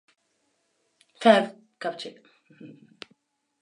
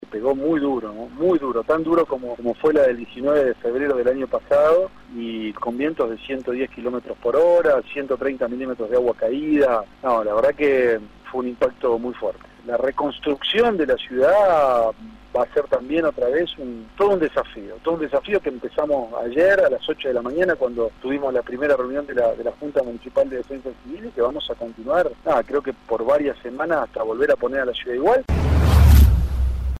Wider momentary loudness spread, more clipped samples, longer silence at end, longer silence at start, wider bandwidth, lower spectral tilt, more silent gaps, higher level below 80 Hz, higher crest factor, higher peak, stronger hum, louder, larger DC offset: first, 27 LU vs 11 LU; neither; first, 0.95 s vs 0 s; first, 1.2 s vs 0.1 s; second, 11 kHz vs 14.5 kHz; second, -5 dB/octave vs -7 dB/octave; neither; second, -84 dBFS vs -28 dBFS; first, 26 dB vs 18 dB; about the same, -4 dBFS vs -2 dBFS; neither; about the same, -23 LUFS vs -21 LUFS; neither